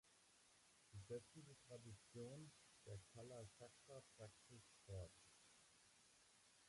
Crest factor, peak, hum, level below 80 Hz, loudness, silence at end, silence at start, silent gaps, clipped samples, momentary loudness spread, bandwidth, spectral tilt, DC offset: 20 dB; -42 dBFS; none; -76 dBFS; -61 LUFS; 0 s; 0.05 s; none; under 0.1%; 10 LU; 11.5 kHz; -5 dB/octave; under 0.1%